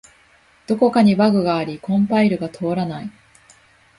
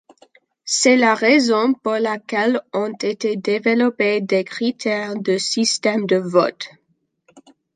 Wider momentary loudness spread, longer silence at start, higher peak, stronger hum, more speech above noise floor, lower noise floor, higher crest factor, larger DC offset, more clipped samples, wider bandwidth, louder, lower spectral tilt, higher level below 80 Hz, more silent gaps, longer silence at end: first, 12 LU vs 9 LU; about the same, 0.7 s vs 0.65 s; about the same, -4 dBFS vs -2 dBFS; neither; second, 37 dB vs 46 dB; second, -54 dBFS vs -65 dBFS; about the same, 16 dB vs 18 dB; neither; neither; first, 11.5 kHz vs 9.6 kHz; about the same, -18 LUFS vs -18 LUFS; first, -7.5 dB/octave vs -3.5 dB/octave; first, -56 dBFS vs -70 dBFS; neither; first, 0.9 s vs 0.35 s